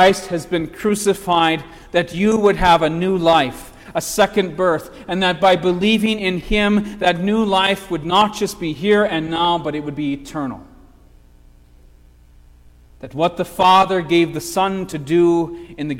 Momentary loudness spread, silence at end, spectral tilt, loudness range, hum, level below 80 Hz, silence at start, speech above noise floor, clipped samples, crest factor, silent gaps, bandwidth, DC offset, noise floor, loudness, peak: 10 LU; 0 s; -5 dB/octave; 8 LU; 60 Hz at -45 dBFS; -40 dBFS; 0 s; 30 dB; under 0.1%; 16 dB; none; 16.5 kHz; under 0.1%; -47 dBFS; -17 LUFS; -2 dBFS